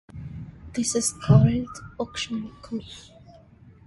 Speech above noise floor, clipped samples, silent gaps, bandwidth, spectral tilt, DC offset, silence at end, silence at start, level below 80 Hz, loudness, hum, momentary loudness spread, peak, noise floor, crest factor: 27 dB; under 0.1%; none; 11.5 kHz; -5.5 dB/octave; under 0.1%; 0.55 s; 0.15 s; -46 dBFS; -24 LUFS; none; 22 LU; -4 dBFS; -51 dBFS; 20 dB